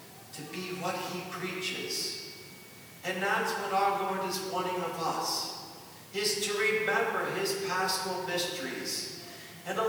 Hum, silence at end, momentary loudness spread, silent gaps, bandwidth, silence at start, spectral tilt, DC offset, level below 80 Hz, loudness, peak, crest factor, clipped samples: none; 0 s; 15 LU; none; over 20 kHz; 0 s; -2.5 dB/octave; under 0.1%; -78 dBFS; -31 LUFS; -16 dBFS; 16 dB; under 0.1%